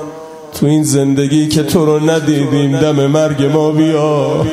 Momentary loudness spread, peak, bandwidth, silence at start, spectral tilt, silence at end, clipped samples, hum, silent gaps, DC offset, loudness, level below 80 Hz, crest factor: 2 LU; 0 dBFS; 15.5 kHz; 0 s; -6 dB/octave; 0 s; under 0.1%; none; none; under 0.1%; -12 LUFS; -44 dBFS; 12 dB